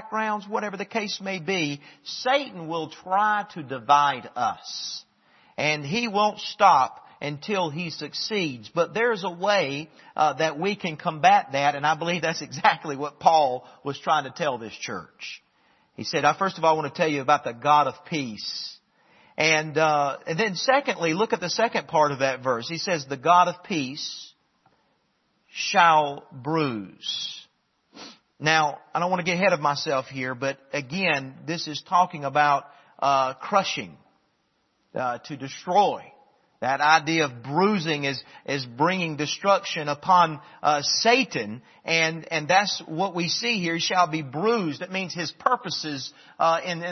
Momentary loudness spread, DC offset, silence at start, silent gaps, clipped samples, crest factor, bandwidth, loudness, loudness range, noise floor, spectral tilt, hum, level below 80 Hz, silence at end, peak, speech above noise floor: 13 LU; under 0.1%; 0 s; none; under 0.1%; 22 dB; 6.4 kHz; -24 LUFS; 4 LU; -70 dBFS; -4 dB/octave; none; -72 dBFS; 0 s; -2 dBFS; 46 dB